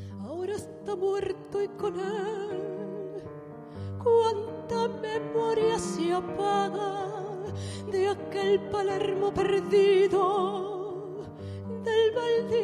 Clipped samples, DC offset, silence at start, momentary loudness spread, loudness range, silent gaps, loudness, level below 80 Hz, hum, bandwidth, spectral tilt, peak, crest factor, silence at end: under 0.1%; under 0.1%; 0 s; 14 LU; 7 LU; none; -28 LUFS; -56 dBFS; none; 11.5 kHz; -5.5 dB/octave; -14 dBFS; 14 dB; 0 s